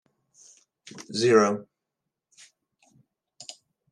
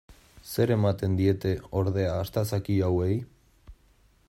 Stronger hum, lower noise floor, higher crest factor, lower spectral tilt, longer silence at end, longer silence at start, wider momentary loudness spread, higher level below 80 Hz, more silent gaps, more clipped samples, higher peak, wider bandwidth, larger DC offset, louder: neither; first, -85 dBFS vs -62 dBFS; first, 24 dB vs 16 dB; second, -4.5 dB/octave vs -7.5 dB/octave; second, 0.4 s vs 0.55 s; first, 0.95 s vs 0.1 s; first, 25 LU vs 5 LU; second, -80 dBFS vs -52 dBFS; neither; neither; first, -6 dBFS vs -10 dBFS; second, 11 kHz vs 16 kHz; neither; first, -23 LUFS vs -27 LUFS